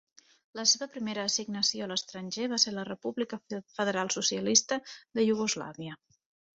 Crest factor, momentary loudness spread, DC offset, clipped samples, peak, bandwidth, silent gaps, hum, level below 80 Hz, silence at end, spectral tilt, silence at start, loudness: 24 dB; 13 LU; under 0.1%; under 0.1%; -8 dBFS; 8 kHz; none; none; -74 dBFS; 0.6 s; -2 dB/octave; 0.55 s; -29 LUFS